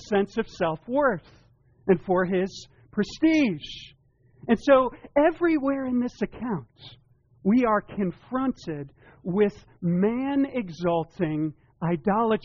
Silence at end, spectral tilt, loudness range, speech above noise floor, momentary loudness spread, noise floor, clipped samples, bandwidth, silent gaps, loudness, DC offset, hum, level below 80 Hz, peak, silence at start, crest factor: 0.05 s; -6 dB/octave; 3 LU; 30 dB; 13 LU; -55 dBFS; under 0.1%; 7.2 kHz; none; -25 LUFS; under 0.1%; none; -54 dBFS; -8 dBFS; 0 s; 18 dB